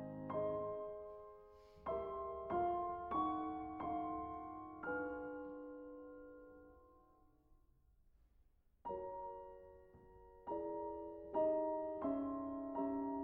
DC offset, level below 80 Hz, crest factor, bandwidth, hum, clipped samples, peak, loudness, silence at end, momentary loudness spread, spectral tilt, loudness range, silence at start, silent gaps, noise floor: under 0.1%; -68 dBFS; 18 dB; 4.4 kHz; none; under 0.1%; -28 dBFS; -44 LUFS; 0 s; 20 LU; -7 dB/octave; 12 LU; 0 s; none; -72 dBFS